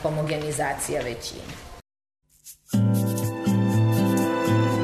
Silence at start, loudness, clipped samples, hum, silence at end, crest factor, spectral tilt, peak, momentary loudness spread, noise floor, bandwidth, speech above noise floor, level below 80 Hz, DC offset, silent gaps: 0 s; -24 LUFS; under 0.1%; none; 0 s; 12 dB; -6 dB/octave; -12 dBFS; 13 LU; -48 dBFS; 13.5 kHz; 20 dB; -50 dBFS; under 0.1%; none